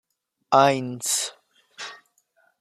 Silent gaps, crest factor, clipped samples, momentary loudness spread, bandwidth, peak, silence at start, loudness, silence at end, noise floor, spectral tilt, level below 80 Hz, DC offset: none; 22 dB; under 0.1%; 20 LU; 15.5 kHz; -4 dBFS; 0.5 s; -22 LUFS; 0.65 s; -66 dBFS; -3 dB/octave; -76 dBFS; under 0.1%